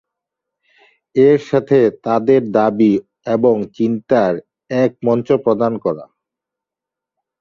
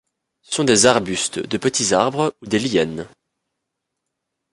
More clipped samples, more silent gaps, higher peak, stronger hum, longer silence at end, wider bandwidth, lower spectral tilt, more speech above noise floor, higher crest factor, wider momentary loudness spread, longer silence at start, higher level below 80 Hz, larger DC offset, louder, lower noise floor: neither; neither; about the same, -2 dBFS vs 0 dBFS; neither; about the same, 1.35 s vs 1.45 s; second, 7 kHz vs 11.5 kHz; first, -8.5 dB/octave vs -3 dB/octave; first, 71 dB vs 60 dB; about the same, 16 dB vs 20 dB; second, 9 LU vs 12 LU; first, 1.15 s vs 0.5 s; about the same, -58 dBFS vs -54 dBFS; neither; about the same, -16 LUFS vs -18 LUFS; first, -85 dBFS vs -79 dBFS